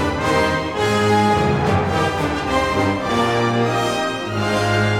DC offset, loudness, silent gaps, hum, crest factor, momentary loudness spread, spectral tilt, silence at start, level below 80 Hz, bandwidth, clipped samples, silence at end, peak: under 0.1%; -18 LUFS; none; none; 14 dB; 4 LU; -5.5 dB/octave; 0 s; -38 dBFS; 16.5 kHz; under 0.1%; 0 s; -4 dBFS